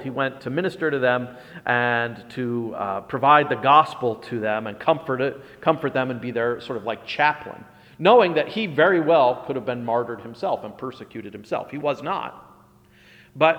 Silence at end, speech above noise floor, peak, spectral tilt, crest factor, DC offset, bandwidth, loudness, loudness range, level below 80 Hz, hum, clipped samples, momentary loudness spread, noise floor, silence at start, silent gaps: 0 s; 31 dB; -2 dBFS; -7 dB/octave; 20 dB; under 0.1%; 11.5 kHz; -22 LUFS; 8 LU; -64 dBFS; none; under 0.1%; 14 LU; -53 dBFS; 0 s; none